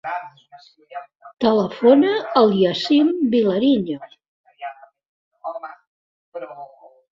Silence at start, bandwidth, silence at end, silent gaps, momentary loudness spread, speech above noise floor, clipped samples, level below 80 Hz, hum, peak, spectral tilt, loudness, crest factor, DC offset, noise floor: 0.05 s; 7.4 kHz; 0.45 s; 4.28-4.44 s, 5.08-5.31 s, 5.87-6.32 s; 22 LU; 24 dB; under 0.1%; -62 dBFS; none; -2 dBFS; -7 dB/octave; -17 LUFS; 18 dB; under 0.1%; -43 dBFS